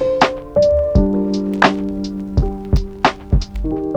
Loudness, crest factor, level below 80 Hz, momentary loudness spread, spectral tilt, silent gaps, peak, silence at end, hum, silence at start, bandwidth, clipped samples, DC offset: -17 LUFS; 16 dB; -24 dBFS; 8 LU; -6.5 dB/octave; none; 0 dBFS; 0 s; none; 0 s; 9.4 kHz; under 0.1%; under 0.1%